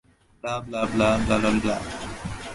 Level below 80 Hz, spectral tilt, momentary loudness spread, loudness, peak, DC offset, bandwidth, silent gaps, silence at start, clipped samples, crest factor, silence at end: -42 dBFS; -5.5 dB/octave; 13 LU; -25 LUFS; -8 dBFS; under 0.1%; 11.5 kHz; none; 0.45 s; under 0.1%; 16 dB; 0 s